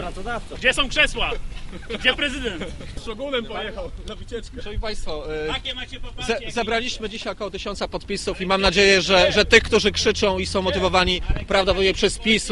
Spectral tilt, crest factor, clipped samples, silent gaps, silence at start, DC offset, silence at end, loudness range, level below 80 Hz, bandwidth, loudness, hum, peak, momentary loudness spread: -3.5 dB/octave; 22 dB; under 0.1%; none; 0 s; under 0.1%; 0 s; 12 LU; -34 dBFS; 11.5 kHz; -21 LUFS; none; 0 dBFS; 18 LU